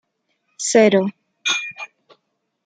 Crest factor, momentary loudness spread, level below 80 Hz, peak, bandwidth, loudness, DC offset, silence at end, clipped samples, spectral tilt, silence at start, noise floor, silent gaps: 20 dB; 19 LU; -70 dBFS; -2 dBFS; 9.6 kHz; -18 LUFS; under 0.1%; 0.8 s; under 0.1%; -3.5 dB/octave; 0.6 s; -72 dBFS; none